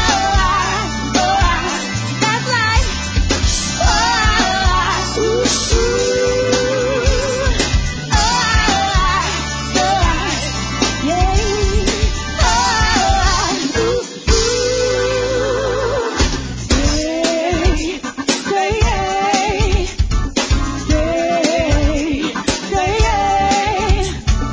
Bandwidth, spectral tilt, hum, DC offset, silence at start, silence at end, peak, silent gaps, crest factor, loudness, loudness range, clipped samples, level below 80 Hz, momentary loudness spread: 8 kHz; -4 dB/octave; none; under 0.1%; 0 s; 0 s; -2 dBFS; none; 14 dB; -16 LUFS; 2 LU; under 0.1%; -20 dBFS; 5 LU